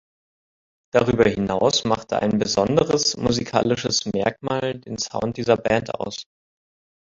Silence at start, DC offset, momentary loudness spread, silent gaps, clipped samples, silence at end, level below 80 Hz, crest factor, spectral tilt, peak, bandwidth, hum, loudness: 0.95 s; under 0.1%; 9 LU; none; under 0.1%; 0.9 s; -48 dBFS; 22 dB; -4.5 dB/octave; -2 dBFS; 7.8 kHz; none; -21 LUFS